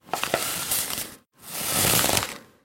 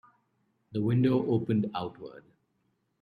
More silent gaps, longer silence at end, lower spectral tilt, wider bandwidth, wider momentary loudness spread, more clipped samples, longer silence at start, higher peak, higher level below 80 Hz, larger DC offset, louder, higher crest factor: neither; second, 0.2 s vs 0.8 s; second, -1.5 dB/octave vs -10 dB/octave; first, 17 kHz vs 4.9 kHz; second, 14 LU vs 17 LU; neither; second, 0.05 s vs 0.7 s; first, -2 dBFS vs -14 dBFS; first, -50 dBFS vs -68 dBFS; neither; first, -23 LUFS vs -29 LUFS; first, 26 dB vs 16 dB